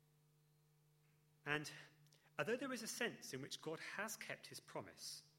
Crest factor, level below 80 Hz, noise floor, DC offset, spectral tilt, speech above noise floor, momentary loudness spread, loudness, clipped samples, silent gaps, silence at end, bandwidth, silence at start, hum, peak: 26 dB; -88 dBFS; -76 dBFS; under 0.1%; -3 dB/octave; 28 dB; 10 LU; -47 LUFS; under 0.1%; none; 0.1 s; 16 kHz; 1.45 s; none; -24 dBFS